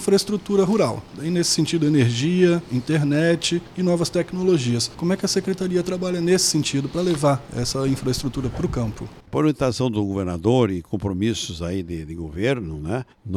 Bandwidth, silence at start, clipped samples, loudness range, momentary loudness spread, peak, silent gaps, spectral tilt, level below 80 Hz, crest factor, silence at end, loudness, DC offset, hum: 15.5 kHz; 0 s; under 0.1%; 3 LU; 9 LU; -4 dBFS; none; -5 dB/octave; -44 dBFS; 16 dB; 0 s; -22 LUFS; under 0.1%; none